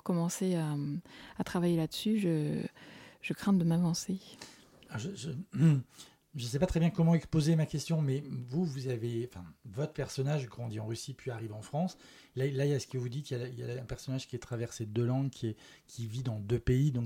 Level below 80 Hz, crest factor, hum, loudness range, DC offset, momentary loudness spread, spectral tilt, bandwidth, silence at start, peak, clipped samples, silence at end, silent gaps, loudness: -56 dBFS; 18 dB; none; 6 LU; under 0.1%; 15 LU; -6.5 dB/octave; 16.5 kHz; 0.05 s; -16 dBFS; under 0.1%; 0 s; none; -34 LUFS